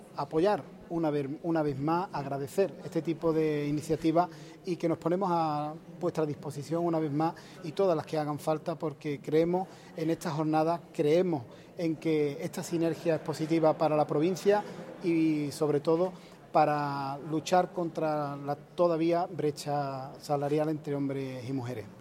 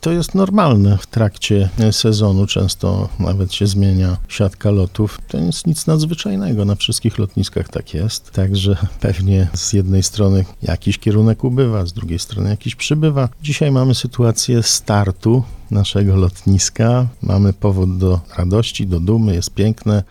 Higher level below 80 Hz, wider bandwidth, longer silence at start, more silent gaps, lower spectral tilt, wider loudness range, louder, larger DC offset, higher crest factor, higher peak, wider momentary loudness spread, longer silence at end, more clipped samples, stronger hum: second, -66 dBFS vs -34 dBFS; first, 16 kHz vs 14 kHz; about the same, 0 s vs 0 s; neither; first, -7 dB/octave vs -5.5 dB/octave; about the same, 3 LU vs 3 LU; second, -30 LUFS vs -16 LUFS; neither; about the same, 18 dB vs 14 dB; second, -12 dBFS vs 0 dBFS; first, 9 LU vs 6 LU; about the same, 0 s vs 0.05 s; neither; neither